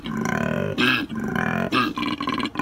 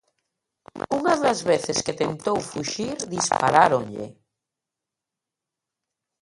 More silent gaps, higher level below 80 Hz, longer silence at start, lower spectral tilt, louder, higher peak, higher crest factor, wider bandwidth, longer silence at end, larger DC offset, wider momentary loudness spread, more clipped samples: neither; first, -50 dBFS vs -60 dBFS; second, 0 s vs 0.75 s; first, -5 dB/octave vs -3.5 dB/octave; about the same, -23 LUFS vs -23 LUFS; second, -6 dBFS vs -2 dBFS; second, 18 dB vs 24 dB; first, 16.5 kHz vs 11.5 kHz; second, 0 s vs 2.1 s; neither; second, 6 LU vs 14 LU; neither